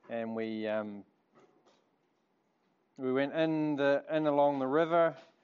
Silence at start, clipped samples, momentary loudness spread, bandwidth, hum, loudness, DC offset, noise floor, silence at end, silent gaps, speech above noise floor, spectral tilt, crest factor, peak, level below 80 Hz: 0.1 s; under 0.1%; 10 LU; 7 kHz; none; -31 LUFS; under 0.1%; -75 dBFS; 0.2 s; none; 45 dB; -5 dB/octave; 18 dB; -16 dBFS; -88 dBFS